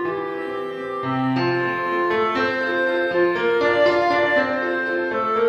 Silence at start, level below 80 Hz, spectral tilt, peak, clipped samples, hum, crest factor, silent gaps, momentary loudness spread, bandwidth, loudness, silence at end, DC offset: 0 s; -60 dBFS; -6.5 dB/octave; -8 dBFS; under 0.1%; none; 12 dB; none; 9 LU; 7.8 kHz; -21 LUFS; 0 s; under 0.1%